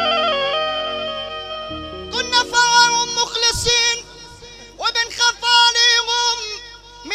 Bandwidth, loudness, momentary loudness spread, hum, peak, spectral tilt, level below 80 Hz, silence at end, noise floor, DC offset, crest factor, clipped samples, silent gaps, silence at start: 15.5 kHz; -16 LUFS; 16 LU; none; 0 dBFS; 0 dB/octave; -44 dBFS; 0 s; -39 dBFS; under 0.1%; 18 dB; under 0.1%; none; 0 s